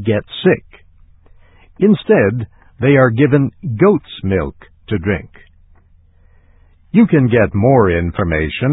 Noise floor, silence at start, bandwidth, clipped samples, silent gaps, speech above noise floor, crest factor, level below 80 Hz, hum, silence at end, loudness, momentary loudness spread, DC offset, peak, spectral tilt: -48 dBFS; 0 s; 4 kHz; under 0.1%; none; 35 dB; 16 dB; -34 dBFS; none; 0 s; -14 LUFS; 9 LU; under 0.1%; 0 dBFS; -11.5 dB/octave